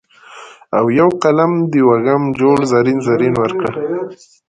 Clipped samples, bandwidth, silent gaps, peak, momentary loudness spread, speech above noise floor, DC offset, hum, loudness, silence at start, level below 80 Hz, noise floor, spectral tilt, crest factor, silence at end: under 0.1%; 10 kHz; none; 0 dBFS; 8 LU; 24 dB; under 0.1%; none; -14 LUFS; 0.3 s; -52 dBFS; -38 dBFS; -7.5 dB/octave; 14 dB; 0.35 s